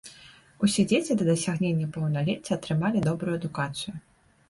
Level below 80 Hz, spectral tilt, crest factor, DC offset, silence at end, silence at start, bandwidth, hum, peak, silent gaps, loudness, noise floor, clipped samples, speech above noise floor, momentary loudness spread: -58 dBFS; -5.5 dB/octave; 16 dB; under 0.1%; 0.5 s; 0.05 s; 11.5 kHz; none; -10 dBFS; none; -27 LUFS; -52 dBFS; under 0.1%; 26 dB; 9 LU